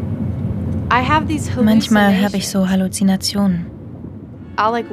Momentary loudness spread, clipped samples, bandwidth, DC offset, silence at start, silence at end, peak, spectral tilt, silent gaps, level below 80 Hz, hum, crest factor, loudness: 19 LU; under 0.1%; 15 kHz; under 0.1%; 0 s; 0 s; 0 dBFS; -5.5 dB/octave; none; -40 dBFS; none; 16 dB; -17 LUFS